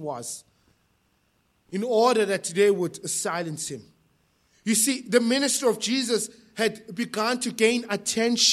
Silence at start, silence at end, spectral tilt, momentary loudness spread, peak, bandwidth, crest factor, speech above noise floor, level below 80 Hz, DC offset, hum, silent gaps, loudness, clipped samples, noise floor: 0 s; 0 s; -2.5 dB/octave; 13 LU; -4 dBFS; 15.5 kHz; 20 dB; 44 dB; -72 dBFS; under 0.1%; none; none; -24 LUFS; under 0.1%; -68 dBFS